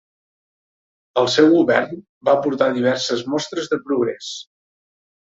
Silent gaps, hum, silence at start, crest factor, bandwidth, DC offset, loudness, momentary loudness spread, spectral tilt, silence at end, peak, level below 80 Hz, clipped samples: 2.09-2.21 s; none; 1.15 s; 18 dB; 7.8 kHz; under 0.1%; -18 LUFS; 14 LU; -4.5 dB/octave; 1 s; -2 dBFS; -64 dBFS; under 0.1%